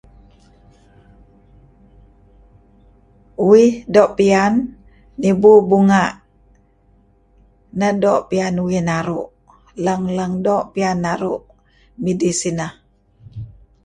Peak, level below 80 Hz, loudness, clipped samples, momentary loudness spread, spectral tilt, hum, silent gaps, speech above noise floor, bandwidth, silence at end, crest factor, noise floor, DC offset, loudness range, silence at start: 0 dBFS; -50 dBFS; -16 LUFS; under 0.1%; 22 LU; -6 dB/octave; none; none; 39 dB; 11.5 kHz; 0.35 s; 18 dB; -54 dBFS; under 0.1%; 8 LU; 3.4 s